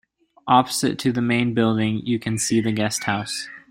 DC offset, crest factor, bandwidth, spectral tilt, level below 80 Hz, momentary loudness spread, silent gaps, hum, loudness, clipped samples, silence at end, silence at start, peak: under 0.1%; 20 dB; 16 kHz; -4.5 dB/octave; -56 dBFS; 7 LU; none; none; -21 LUFS; under 0.1%; 0.1 s; 0.45 s; -2 dBFS